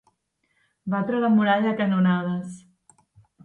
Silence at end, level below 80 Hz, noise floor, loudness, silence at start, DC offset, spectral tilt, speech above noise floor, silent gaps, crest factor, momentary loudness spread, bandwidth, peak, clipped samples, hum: 0.85 s; -70 dBFS; -72 dBFS; -23 LUFS; 0.85 s; under 0.1%; -8 dB/octave; 50 dB; none; 16 dB; 13 LU; 10 kHz; -8 dBFS; under 0.1%; none